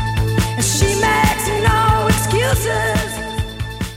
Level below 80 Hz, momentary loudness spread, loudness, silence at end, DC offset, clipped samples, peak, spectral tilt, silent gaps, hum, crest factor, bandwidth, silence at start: -26 dBFS; 10 LU; -17 LUFS; 0 s; 0.1%; under 0.1%; -2 dBFS; -4 dB/octave; none; none; 14 dB; 16.5 kHz; 0 s